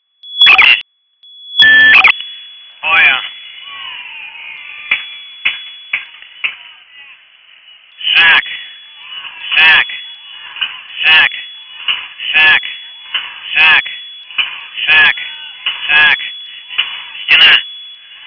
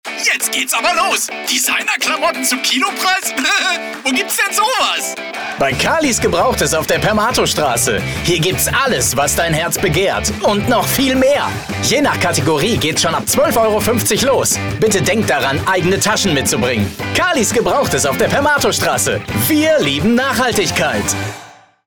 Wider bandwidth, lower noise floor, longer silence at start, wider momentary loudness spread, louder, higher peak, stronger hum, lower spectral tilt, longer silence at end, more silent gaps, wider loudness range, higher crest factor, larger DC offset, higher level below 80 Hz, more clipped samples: second, 5.4 kHz vs over 20 kHz; first, -46 dBFS vs -39 dBFS; first, 0.25 s vs 0.05 s; first, 22 LU vs 4 LU; first, -9 LUFS vs -14 LUFS; first, 0 dBFS vs -4 dBFS; neither; second, -1 dB/octave vs -3 dB/octave; second, 0.15 s vs 0.35 s; neither; first, 11 LU vs 1 LU; about the same, 14 dB vs 12 dB; neither; second, -52 dBFS vs -40 dBFS; neither